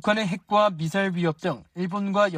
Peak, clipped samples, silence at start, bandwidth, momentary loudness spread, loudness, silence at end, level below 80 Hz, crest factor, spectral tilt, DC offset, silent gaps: -8 dBFS; under 0.1%; 0.05 s; 15 kHz; 8 LU; -25 LUFS; 0 s; -64 dBFS; 16 dB; -6 dB/octave; under 0.1%; none